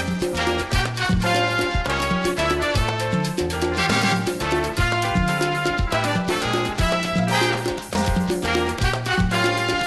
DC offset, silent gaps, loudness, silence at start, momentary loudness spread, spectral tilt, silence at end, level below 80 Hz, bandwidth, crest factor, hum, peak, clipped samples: under 0.1%; none; -21 LUFS; 0 s; 3 LU; -4.5 dB/octave; 0 s; -32 dBFS; 13 kHz; 14 dB; none; -8 dBFS; under 0.1%